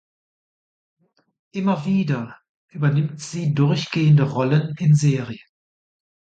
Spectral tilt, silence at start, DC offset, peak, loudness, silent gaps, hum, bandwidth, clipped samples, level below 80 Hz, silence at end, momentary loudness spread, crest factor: -7 dB/octave; 1.55 s; under 0.1%; -6 dBFS; -20 LUFS; 2.49-2.68 s; none; 8.8 kHz; under 0.1%; -62 dBFS; 1.05 s; 17 LU; 16 dB